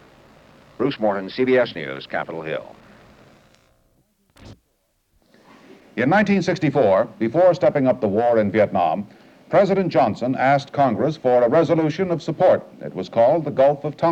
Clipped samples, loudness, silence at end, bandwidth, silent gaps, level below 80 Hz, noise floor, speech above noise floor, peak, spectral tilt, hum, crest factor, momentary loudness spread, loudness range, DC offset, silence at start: under 0.1%; -19 LUFS; 0 s; 8.2 kHz; none; -60 dBFS; -67 dBFS; 49 dB; -4 dBFS; -7.5 dB/octave; none; 16 dB; 11 LU; 10 LU; under 0.1%; 0.8 s